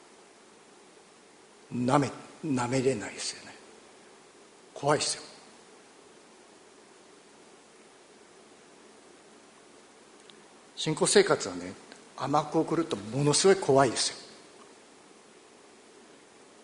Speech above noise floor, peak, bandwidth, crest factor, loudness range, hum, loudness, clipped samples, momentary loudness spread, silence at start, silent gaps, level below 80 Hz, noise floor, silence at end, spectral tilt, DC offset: 29 dB; -6 dBFS; 10.5 kHz; 26 dB; 9 LU; none; -27 LUFS; under 0.1%; 25 LU; 1.7 s; none; -70 dBFS; -56 dBFS; 2 s; -4 dB/octave; under 0.1%